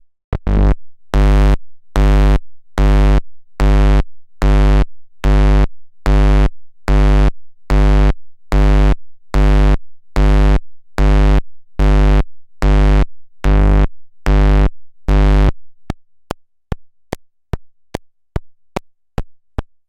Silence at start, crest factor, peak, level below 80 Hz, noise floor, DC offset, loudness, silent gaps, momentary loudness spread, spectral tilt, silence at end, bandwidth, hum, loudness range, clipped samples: 0.3 s; 12 dB; 0 dBFS; -14 dBFS; -31 dBFS; under 0.1%; -15 LUFS; none; 17 LU; -7.5 dB/octave; 0.25 s; 7.4 kHz; none; 6 LU; under 0.1%